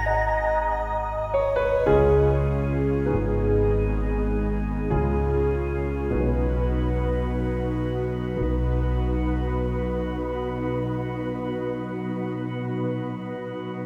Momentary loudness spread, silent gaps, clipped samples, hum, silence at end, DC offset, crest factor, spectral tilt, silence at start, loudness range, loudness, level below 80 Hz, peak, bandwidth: 7 LU; none; under 0.1%; none; 0 s; under 0.1%; 16 dB; -9.5 dB/octave; 0 s; 6 LU; -25 LUFS; -30 dBFS; -8 dBFS; 6 kHz